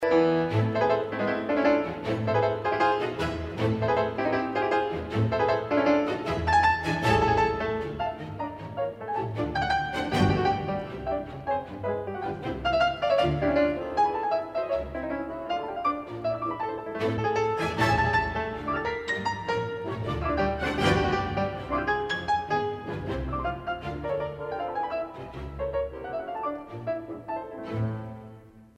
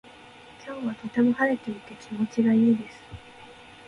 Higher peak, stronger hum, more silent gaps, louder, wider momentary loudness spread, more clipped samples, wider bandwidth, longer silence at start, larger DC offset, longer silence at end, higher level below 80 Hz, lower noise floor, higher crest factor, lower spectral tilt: about the same, -8 dBFS vs -10 dBFS; neither; neither; second, -28 LUFS vs -25 LUFS; second, 10 LU vs 24 LU; neither; first, 13.5 kHz vs 9.8 kHz; second, 0 s vs 0.6 s; neither; second, 0.15 s vs 0.35 s; first, -46 dBFS vs -60 dBFS; about the same, -49 dBFS vs -48 dBFS; about the same, 18 dB vs 16 dB; about the same, -6.5 dB/octave vs -7 dB/octave